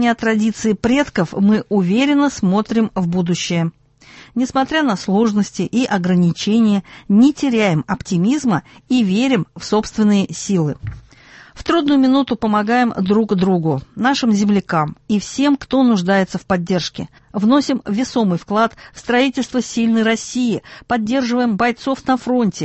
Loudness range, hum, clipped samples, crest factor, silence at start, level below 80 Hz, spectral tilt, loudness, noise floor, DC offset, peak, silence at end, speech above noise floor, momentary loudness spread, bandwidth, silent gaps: 2 LU; none; under 0.1%; 16 dB; 0 s; -48 dBFS; -6 dB/octave; -17 LUFS; -44 dBFS; under 0.1%; -2 dBFS; 0 s; 27 dB; 6 LU; 8.4 kHz; none